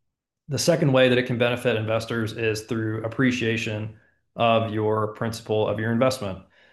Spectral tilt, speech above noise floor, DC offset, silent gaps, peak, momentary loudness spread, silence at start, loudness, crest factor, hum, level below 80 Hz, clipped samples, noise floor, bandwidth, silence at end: -5.5 dB/octave; 28 dB; under 0.1%; none; -6 dBFS; 12 LU; 0.5 s; -24 LUFS; 18 dB; none; -62 dBFS; under 0.1%; -52 dBFS; 12.5 kHz; 0.3 s